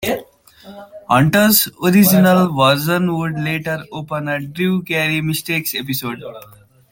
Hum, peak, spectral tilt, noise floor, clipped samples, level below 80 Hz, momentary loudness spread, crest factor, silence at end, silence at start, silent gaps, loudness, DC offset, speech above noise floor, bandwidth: none; 0 dBFS; -5 dB/octave; -42 dBFS; under 0.1%; -52 dBFS; 14 LU; 16 dB; 0.5 s; 0 s; none; -16 LUFS; under 0.1%; 26 dB; 17 kHz